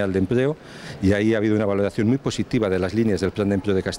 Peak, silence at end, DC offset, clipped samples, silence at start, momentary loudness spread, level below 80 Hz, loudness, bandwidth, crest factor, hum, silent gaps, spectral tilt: -6 dBFS; 0 s; under 0.1%; under 0.1%; 0 s; 5 LU; -48 dBFS; -22 LUFS; 12 kHz; 14 dB; none; none; -7 dB/octave